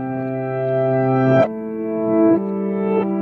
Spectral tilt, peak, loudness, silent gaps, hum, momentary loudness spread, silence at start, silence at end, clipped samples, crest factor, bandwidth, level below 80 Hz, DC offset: -10.5 dB/octave; -2 dBFS; -19 LUFS; none; none; 8 LU; 0 s; 0 s; under 0.1%; 16 dB; 6 kHz; -58 dBFS; under 0.1%